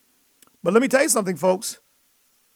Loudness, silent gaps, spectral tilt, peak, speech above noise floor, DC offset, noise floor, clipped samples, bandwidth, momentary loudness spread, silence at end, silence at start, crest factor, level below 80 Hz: -21 LUFS; none; -3.5 dB/octave; -4 dBFS; 43 dB; under 0.1%; -63 dBFS; under 0.1%; 19 kHz; 12 LU; 0.8 s; 0.65 s; 18 dB; -70 dBFS